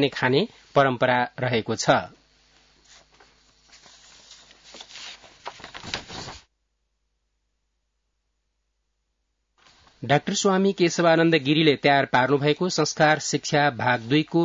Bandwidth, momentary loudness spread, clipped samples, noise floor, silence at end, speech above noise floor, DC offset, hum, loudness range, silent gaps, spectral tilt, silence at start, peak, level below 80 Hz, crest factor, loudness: 7.8 kHz; 20 LU; under 0.1%; -75 dBFS; 0 s; 54 dB; under 0.1%; none; 20 LU; none; -4.5 dB/octave; 0 s; -4 dBFS; -62 dBFS; 20 dB; -22 LUFS